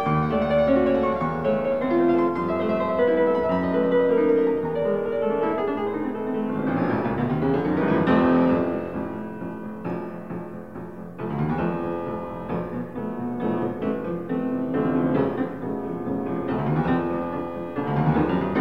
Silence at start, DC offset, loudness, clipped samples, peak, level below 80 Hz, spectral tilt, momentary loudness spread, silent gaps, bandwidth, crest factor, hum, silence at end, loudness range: 0 s; 0.4%; -24 LUFS; under 0.1%; -8 dBFS; -48 dBFS; -9.5 dB/octave; 11 LU; none; 5.6 kHz; 16 dB; none; 0 s; 8 LU